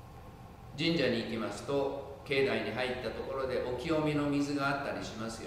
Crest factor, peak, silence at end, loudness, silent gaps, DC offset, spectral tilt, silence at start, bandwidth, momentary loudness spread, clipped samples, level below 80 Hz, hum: 16 dB; -18 dBFS; 0 s; -33 LUFS; none; under 0.1%; -5.5 dB/octave; 0 s; 15.5 kHz; 13 LU; under 0.1%; -56 dBFS; none